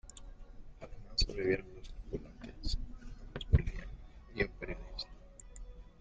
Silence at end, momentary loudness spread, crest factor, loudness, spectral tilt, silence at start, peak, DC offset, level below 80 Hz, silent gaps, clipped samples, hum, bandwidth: 0 s; 22 LU; 26 dB; -38 LUFS; -5.5 dB/octave; 0.05 s; -12 dBFS; under 0.1%; -42 dBFS; none; under 0.1%; none; 9.2 kHz